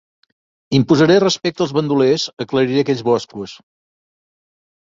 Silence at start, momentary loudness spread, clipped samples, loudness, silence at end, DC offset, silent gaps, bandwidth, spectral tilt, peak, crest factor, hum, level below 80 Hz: 0.7 s; 8 LU; under 0.1%; -16 LUFS; 1.3 s; under 0.1%; 2.33-2.37 s; 7.8 kHz; -5.5 dB/octave; -2 dBFS; 16 dB; none; -56 dBFS